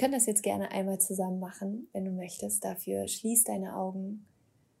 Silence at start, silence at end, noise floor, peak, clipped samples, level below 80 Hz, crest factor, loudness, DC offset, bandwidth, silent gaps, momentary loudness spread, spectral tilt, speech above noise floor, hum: 0 s; 0.6 s; -68 dBFS; -12 dBFS; under 0.1%; -76 dBFS; 20 dB; -31 LUFS; under 0.1%; 16 kHz; none; 12 LU; -4 dB/octave; 36 dB; none